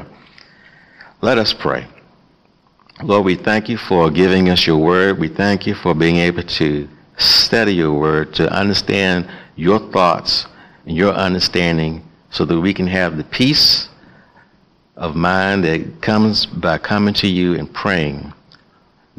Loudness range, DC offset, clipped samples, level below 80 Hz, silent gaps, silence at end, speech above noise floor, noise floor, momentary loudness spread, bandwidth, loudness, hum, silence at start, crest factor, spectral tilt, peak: 3 LU; under 0.1%; under 0.1%; -44 dBFS; none; 0.85 s; 39 dB; -55 dBFS; 10 LU; 15 kHz; -15 LUFS; none; 0 s; 14 dB; -5.5 dB/octave; -2 dBFS